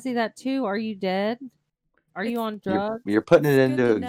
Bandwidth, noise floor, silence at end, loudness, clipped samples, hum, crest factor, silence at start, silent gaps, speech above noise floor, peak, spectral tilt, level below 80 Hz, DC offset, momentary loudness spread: 16.5 kHz; -72 dBFS; 0 s; -23 LUFS; under 0.1%; none; 20 dB; 0 s; none; 49 dB; -4 dBFS; -7 dB/octave; -64 dBFS; under 0.1%; 11 LU